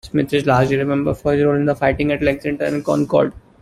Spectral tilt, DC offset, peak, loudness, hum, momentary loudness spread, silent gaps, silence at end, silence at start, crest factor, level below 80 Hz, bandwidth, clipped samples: -7.5 dB/octave; under 0.1%; -2 dBFS; -18 LUFS; none; 5 LU; none; 0.25 s; 0.05 s; 16 dB; -42 dBFS; 14 kHz; under 0.1%